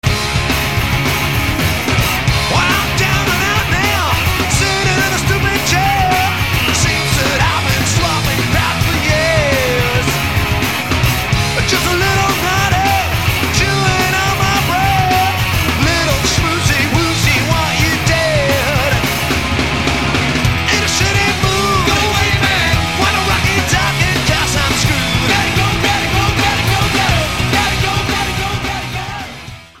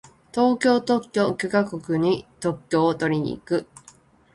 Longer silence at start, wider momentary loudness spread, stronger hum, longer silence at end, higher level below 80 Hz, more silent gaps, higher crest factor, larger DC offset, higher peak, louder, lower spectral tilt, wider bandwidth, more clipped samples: second, 0.05 s vs 0.35 s; second, 3 LU vs 8 LU; neither; second, 0 s vs 0.7 s; first, -26 dBFS vs -58 dBFS; neither; about the same, 14 dB vs 16 dB; first, 1% vs under 0.1%; first, 0 dBFS vs -6 dBFS; first, -13 LUFS vs -23 LUFS; second, -3.5 dB/octave vs -6 dB/octave; first, 16.5 kHz vs 11.5 kHz; neither